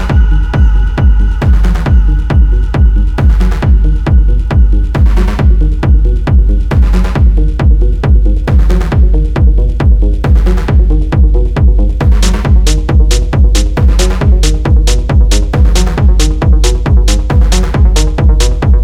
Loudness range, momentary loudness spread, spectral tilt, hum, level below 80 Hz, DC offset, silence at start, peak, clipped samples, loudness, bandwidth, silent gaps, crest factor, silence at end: 0 LU; 1 LU; -6 dB/octave; none; -8 dBFS; under 0.1%; 0 s; 0 dBFS; under 0.1%; -10 LUFS; 11.5 kHz; none; 6 dB; 0 s